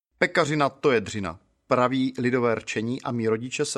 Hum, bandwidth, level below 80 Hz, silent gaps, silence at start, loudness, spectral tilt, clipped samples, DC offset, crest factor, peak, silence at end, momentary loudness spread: none; 12.5 kHz; -62 dBFS; none; 0.2 s; -25 LUFS; -5 dB/octave; under 0.1%; under 0.1%; 20 dB; -4 dBFS; 0 s; 7 LU